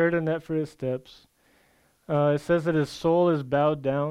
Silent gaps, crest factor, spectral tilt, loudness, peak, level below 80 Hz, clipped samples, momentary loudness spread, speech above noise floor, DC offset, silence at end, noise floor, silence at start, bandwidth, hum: none; 14 dB; -7.5 dB/octave; -25 LUFS; -10 dBFS; -58 dBFS; under 0.1%; 8 LU; 39 dB; under 0.1%; 0 s; -64 dBFS; 0 s; 13 kHz; none